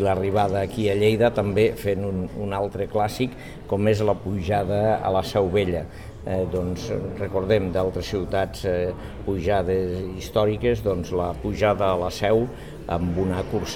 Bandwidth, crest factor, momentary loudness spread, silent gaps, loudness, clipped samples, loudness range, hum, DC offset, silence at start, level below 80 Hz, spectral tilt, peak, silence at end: 17 kHz; 16 dB; 8 LU; none; -24 LUFS; under 0.1%; 2 LU; none; 0.4%; 0 s; -40 dBFS; -6.5 dB/octave; -6 dBFS; 0 s